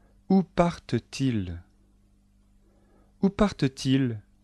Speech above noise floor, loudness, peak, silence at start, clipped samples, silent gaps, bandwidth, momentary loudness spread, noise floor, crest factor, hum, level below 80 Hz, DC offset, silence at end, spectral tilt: 36 dB; -27 LUFS; -8 dBFS; 0.3 s; under 0.1%; none; 11.5 kHz; 7 LU; -61 dBFS; 20 dB; 50 Hz at -55 dBFS; -48 dBFS; under 0.1%; 0.25 s; -7 dB/octave